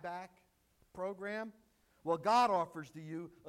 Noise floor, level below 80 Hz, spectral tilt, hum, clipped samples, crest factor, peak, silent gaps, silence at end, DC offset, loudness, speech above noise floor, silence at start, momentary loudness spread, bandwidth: -70 dBFS; -76 dBFS; -5 dB/octave; none; under 0.1%; 18 dB; -20 dBFS; none; 0 s; under 0.1%; -36 LUFS; 33 dB; 0 s; 19 LU; 16 kHz